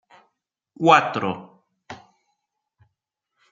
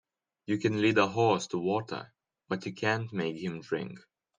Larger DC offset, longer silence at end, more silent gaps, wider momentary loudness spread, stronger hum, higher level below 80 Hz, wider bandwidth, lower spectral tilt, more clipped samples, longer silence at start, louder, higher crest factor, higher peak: neither; first, 1.55 s vs 0.4 s; neither; first, 26 LU vs 13 LU; neither; about the same, -72 dBFS vs -72 dBFS; second, 7.6 kHz vs 9.8 kHz; about the same, -5 dB/octave vs -5.5 dB/octave; neither; first, 0.8 s vs 0.5 s; first, -19 LUFS vs -30 LUFS; about the same, 24 dB vs 22 dB; first, -2 dBFS vs -10 dBFS